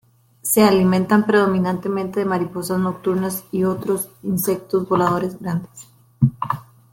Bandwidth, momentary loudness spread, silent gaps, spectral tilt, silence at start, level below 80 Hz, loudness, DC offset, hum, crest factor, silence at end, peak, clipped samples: 17 kHz; 11 LU; none; -6 dB/octave; 0.45 s; -54 dBFS; -20 LUFS; under 0.1%; none; 18 dB; 0.3 s; -2 dBFS; under 0.1%